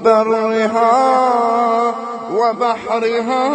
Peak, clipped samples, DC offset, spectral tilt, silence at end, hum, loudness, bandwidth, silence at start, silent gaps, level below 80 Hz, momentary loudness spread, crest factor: 0 dBFS; under 0.1%; under 0.1%; -4.5 dB/octave; 0 s; none; -15 LUFS; 9.8 kHz; 0 s; none; -64 dBFS; 6 LU; 14 dB